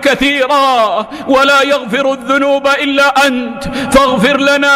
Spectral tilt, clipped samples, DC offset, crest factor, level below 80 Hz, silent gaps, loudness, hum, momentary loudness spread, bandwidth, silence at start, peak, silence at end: -3.5 dB/octave; under 0.1%; under 0.1%; 10 dB; -38 dBFS; none; -10 LUFS; none; 6 LU; 16 kHz; 0 s; 0 dBFS; 0 s